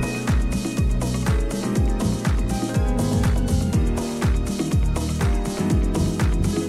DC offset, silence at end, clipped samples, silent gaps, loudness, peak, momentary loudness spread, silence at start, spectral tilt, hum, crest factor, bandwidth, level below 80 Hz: under 0.1%; 0 s; under 0.1%; none; -23 LUFS; -8 dBFS; 3 LU; 0 s; -6 dB/octave; none; 12 dB; 15 kHz; -24 dBFS